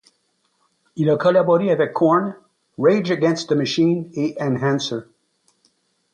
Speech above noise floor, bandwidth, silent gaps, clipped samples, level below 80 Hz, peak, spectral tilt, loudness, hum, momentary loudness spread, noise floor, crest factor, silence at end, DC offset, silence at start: 49 dB; 9.8 kHz; none; under 0.1%; -66 dBFS; -4 dBFS; -6.5 dB/octave; -19 LUFS; none; 9 LU; -67 dBFS; 16 dB; 1.1 s; under 0.1%; 0.95 s